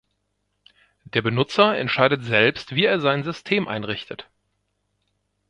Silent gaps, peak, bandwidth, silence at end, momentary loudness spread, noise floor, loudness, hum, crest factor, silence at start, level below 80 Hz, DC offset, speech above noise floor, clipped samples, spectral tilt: none; 0 dBFS; 10.5 kHz; 1.25 s; 11 LU; -74 dBFS; -21 LUFS; 50 Hz at -50 dBFS; 24 dB; 1.15 s; -60 dBFS; under 0.1%; 52 dB; under 0.1%; -6 dB/octave